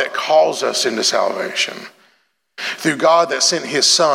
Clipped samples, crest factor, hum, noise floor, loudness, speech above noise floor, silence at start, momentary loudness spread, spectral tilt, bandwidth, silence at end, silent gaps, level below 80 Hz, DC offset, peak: under 0.1%; 16 dB; none; -61 dBFS; -16 LUFS; 44 dB; 0 s; 8 LU; -1.5 dB/octave; 16.5 kHz; 0 s; none; -80 dBFS; under 0.1%; -2 dBFS